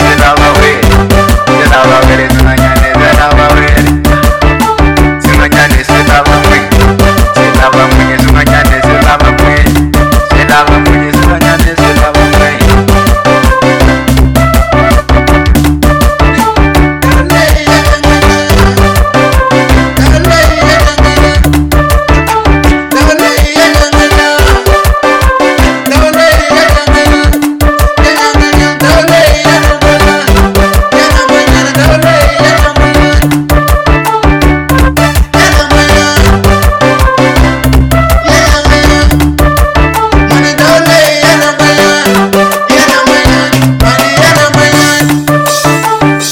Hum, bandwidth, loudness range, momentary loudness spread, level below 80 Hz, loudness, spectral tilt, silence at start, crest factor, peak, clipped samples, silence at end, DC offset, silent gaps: none; 18 kHz; 1 LU; 3 LU; -10 dBFS; -6 LUFS; -5 dB/octave; 0 s; 6 dB; 0 dBFS; 4%; 0 s; under 0.1%; none